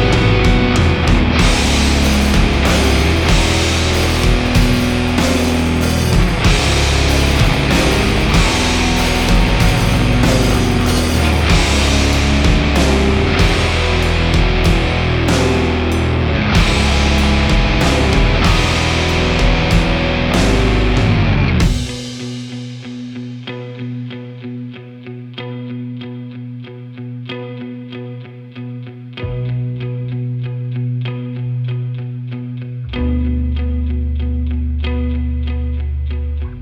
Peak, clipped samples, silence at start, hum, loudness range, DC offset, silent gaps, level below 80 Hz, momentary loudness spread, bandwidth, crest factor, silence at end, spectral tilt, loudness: 0 dBFS; under 0.1%; 0 s; none; 14 LU; under 0.1%; none; -18 dBFS; 15 LU; 18.5 kHz; 14 dB; 0 s; -5 dB/octave; -15 LUFS